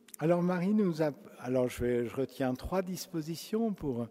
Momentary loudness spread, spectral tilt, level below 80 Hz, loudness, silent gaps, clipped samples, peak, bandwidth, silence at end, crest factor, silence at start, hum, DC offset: 8 LU; -6.5 dB/octave; -56 dBFS; -32 LUFS; none; under 0.1%; -14 dBFS; 16 kHz; 0 s; 18 dB; 0.2 s; none; under 0.1%